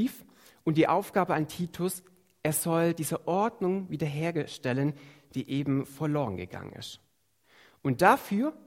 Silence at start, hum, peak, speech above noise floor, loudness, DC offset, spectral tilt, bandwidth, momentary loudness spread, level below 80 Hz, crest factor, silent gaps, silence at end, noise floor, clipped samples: 0 s; none; -6 dBFS; 40 dB; -29 LUFS; under 0.1%; -5.5 dB/octave; 16 kHz; 16 LU; -66 dBFS; 24 dB; none; 0.1 s; -68 dBFS; under 0.1%